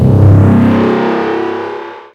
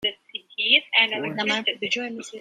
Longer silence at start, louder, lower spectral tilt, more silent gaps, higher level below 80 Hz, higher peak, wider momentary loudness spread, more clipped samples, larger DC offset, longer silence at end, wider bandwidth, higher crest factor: about the same, 0 s vs 0 s; first, -10 LUFS vs -21 LUFS; first, -9.5 dB/octave vs -2 dB/octave; neither; first, -30 dBFS vs -74 dBFS; first, 0 dBFS vs -4 dBFS; about the same, 14 LU vs 16 LU; first, 1% vs under 0.1%; neither; about the same, 0.1 s vs 0 s; second, 5.6 kHz vs 14 kHz; second, 10 dB vs 22 dB